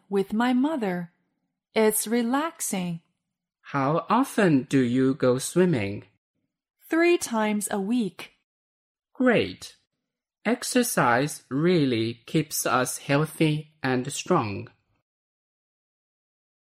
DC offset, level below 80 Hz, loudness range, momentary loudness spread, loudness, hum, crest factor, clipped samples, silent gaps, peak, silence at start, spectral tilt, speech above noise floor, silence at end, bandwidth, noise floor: under 0.1%; -66 dBFS; 4 LU; 11 LU; -25 LUFS; none; 18 dB; under 0.1%; 6.18-6.34 s, 8.44-8.95 s; -8 dBFS; 0.1 s; -5 dB/octave; 61 dB; 2 s; 16 kHz; -85 dBFS